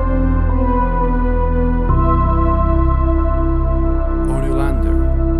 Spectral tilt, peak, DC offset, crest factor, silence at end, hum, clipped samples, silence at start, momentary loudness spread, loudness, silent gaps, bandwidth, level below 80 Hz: -10 dB/octave; -2 dBFS; under 0.1%; 12 dB; 0 s; none; under 0.1%; 0 s; 3 LU; -17 LUFS; none; 3.6 kHz; -16 dBFS